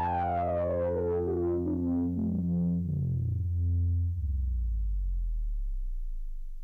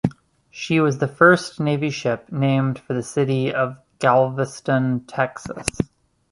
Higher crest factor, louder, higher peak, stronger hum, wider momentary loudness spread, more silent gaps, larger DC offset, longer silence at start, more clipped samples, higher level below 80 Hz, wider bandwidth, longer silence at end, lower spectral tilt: second, 8 dB vs 20 dB; second, -31 LUFS vs -21 LUFS; second, -22 dBFS vs 0 dBFS; neither; about the same, 10 LU vs 11 LU; neither; neither; about the same, 0 s vs 0.05 s; neither; first, -34 dBFS vs -52 dBFS; second, 3.3 kHz vs 11.5 kHz; second, 0 s vs 0.45 s; first, -12 dB/octave vs -6 dB/octave